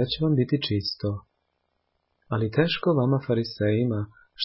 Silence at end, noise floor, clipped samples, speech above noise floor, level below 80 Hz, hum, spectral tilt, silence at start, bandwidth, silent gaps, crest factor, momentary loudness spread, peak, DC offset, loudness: 0 s; -75 dBFS; under 0.1%; 51 dB; -52 dBFS; none; -10.5 dB/octave; 0 s; 5.8 kHz; none; 18 dB; 9 LU; -8 dBFS; under 0.1%; -25 LUFS